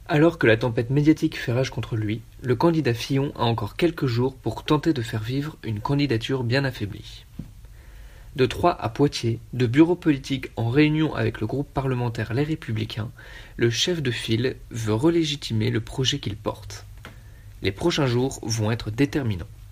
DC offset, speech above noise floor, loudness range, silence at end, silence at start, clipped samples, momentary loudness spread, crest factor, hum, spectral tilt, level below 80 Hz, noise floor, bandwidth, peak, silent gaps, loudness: under 0.1%; 20 dB; 4 LU; 0 s; 0 s; under 0.1%; 13 LU; 20 dB; none; -6 dB/octave; -46 dBFS; -44 dBFS; 15.5 kHz; -4 dBFS; none; -24 LUFS